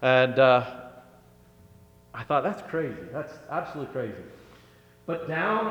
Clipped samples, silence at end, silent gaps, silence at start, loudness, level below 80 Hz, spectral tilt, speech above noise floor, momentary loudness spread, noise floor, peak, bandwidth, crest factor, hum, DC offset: under 0.1%; 0 s; none; 0 s; -26 LUFS; -64 dBFS; -7 dB/octave; 30 dB; 24 LU; -55 dBFS; -6 dBFS; 19 kHz; 20 dB; 60 Hz at -60 dBFS; under 0.1%